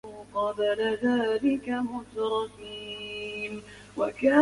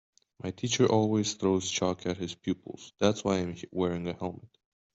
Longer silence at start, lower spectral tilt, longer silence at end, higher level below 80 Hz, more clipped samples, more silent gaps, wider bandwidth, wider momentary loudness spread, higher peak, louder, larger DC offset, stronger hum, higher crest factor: second, 0.05 s vs 0.45 s; about the same, -5 dB/octave vs -5 dB/octave; second, 0 s vs 0.5 s; about the same, -60 dBFS vs -64 dBFS; neither; neither; first, 11.5 kHz vs 8.2 kHz; second, 11 LU vs 14 LU; about the same, -8 dBFS vs -10 dBFS; about the same, -29 LUFS vs -30 LUFS; neither; neither; about the same, 20 dB vs 20 dB